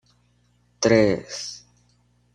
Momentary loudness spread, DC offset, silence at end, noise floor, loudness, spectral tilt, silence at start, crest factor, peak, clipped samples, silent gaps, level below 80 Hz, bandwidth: 17 LU; under 0.1%; 0.75 s; -63 dBFS; -21 LUFS; -4.5 dB/octave; 0.8 s; 22 dB; -2 dBFS; under 0.1%; none; -54 dBFS; 10 kHz